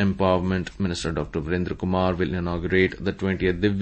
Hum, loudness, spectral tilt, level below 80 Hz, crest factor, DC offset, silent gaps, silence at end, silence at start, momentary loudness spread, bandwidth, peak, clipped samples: none; -24 LUFS; -6.5 dB/octave; -40 dBFS; 18 dB; under 0.1%; none; 0 s; 0 s; 6 LU; 8.8 kHz; -6 dBFS; under 0.1%